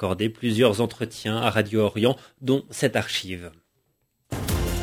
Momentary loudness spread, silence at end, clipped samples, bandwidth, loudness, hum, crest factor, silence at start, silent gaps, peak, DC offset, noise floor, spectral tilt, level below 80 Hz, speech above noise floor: 11 LU; 0 s; under 0.1%; 16 kHz; -24 LUFS; none; 20 dB; 0 s; none; -4 dBFS; under 0.1%; -71 dBFS; -5 dB/octave; -38 dBFS; 47 dB